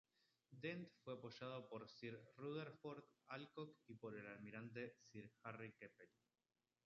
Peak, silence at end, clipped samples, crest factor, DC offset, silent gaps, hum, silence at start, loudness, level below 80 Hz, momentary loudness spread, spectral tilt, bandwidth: -36 dBFS; 0.8 s; under 0.1%; 20 dB; under 0.1%; none; none; 0.5 s; -56 LUFS; under -90 dBFS; 8 LU; -5 dB/octave; 7.2 kHz